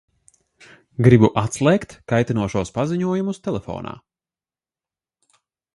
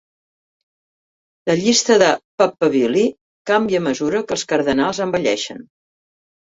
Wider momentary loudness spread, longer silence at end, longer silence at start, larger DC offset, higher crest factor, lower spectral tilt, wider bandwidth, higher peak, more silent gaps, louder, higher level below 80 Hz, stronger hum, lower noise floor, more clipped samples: first, 17 LU vs 9 LU; first, 1.85 s vs 0.85 s; second, 1 s vs 1.45 s; neither; about the same, 22 dB vs 18 dB; first, -7 dB/octave vs -3.5 dB/octave; first, 11.5 kHz vs 8 kHz; about the same, 0 dBFS vs -2 dBFS; second, none vs 2.24-2.38 s, 3.21-3.45 s; about the same, -19 LUFS vs -18 LUFS; first, -48 dBFS vs -56 dBFS; neither; about the same, under -90 dBFS vs under -90 dBFS; neither